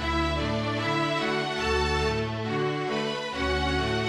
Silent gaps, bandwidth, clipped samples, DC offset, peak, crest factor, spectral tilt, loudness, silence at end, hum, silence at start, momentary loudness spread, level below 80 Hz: none; 12 kHz; under 0.1%; under 0.1%; -14 dBFS; 12 dB; -5 dB/octave; -27 LUFS; 0 s; none; 0 s; 3 LU; -38 dBFS